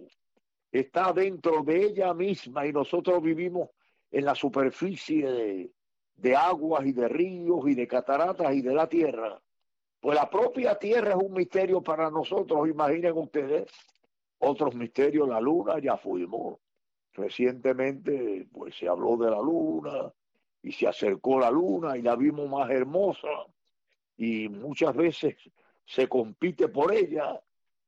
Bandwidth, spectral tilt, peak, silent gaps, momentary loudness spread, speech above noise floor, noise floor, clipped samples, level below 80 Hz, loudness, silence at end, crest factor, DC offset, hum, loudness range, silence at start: 7.8 kHz; -7 dB/octave; -14 dBFS; none; 10 LU; 60 dB; -87 dBFS; under 0.1%; -74 dBFS; -27 LUFS; 0.5 s; 14 dB; under 0.1%; none; 3 LU; 0 s